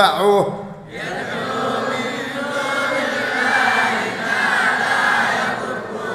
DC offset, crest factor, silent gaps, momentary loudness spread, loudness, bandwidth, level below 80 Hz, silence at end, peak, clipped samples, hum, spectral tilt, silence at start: under 0.1%; 18 dB; none; 10 LU; -18 LUFS; 16 kHz; -58 dBFS; 0 s; 0 dBFS; under 0.1%; none; -3.5 dB/octave; 0 s